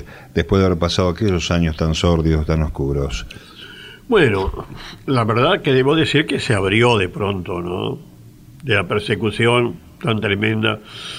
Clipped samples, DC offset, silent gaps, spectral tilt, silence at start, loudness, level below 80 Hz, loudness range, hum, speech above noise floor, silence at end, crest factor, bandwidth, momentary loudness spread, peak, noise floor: under 0.1%; under 0.1%; none; -6 dB/octave; 0 s; -18 LUFS; -32 dBFS; 3 LU; none; 24 dB; 0 s; 18 dB; 15.5 kHz; 16 LU; -2 dBFS; -42 dBFS